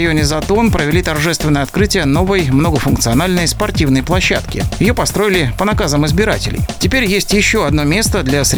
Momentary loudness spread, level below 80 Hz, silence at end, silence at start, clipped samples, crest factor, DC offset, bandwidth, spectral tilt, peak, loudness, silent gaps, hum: 3 LU; -24 dBFS; 0 s; 0 s; under 0.1%; 14 dB; under 0.1%; over 20 kHz; -4.5 dB/octave; 0 dBFS; -13 LUFS; none; none